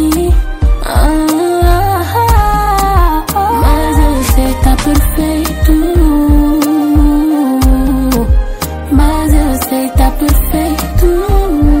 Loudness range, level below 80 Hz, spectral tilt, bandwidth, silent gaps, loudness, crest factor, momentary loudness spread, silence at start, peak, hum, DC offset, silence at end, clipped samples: 2 LU; -12 dBFS; -6 dB/octave; 16.5 kHz; none; -11 LUFS; 10 dB; 4 LU; 0 s; 0 dBFS; none; under 0.1%; 0 s; under 0.1%